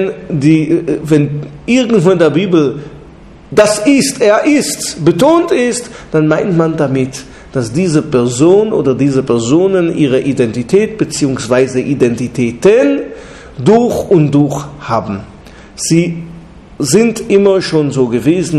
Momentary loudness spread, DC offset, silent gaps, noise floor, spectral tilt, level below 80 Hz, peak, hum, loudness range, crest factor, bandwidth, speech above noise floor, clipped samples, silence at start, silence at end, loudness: 10 LU; under 0.1%; none; -35 dBFS; -5.5 dB/octave; -42 dBFS; 0 dBFS; none; 2 LU; 12 dB; 13.5 kHz; 25 dB; 0.3%; 0 s; 0 s; -12 LUFS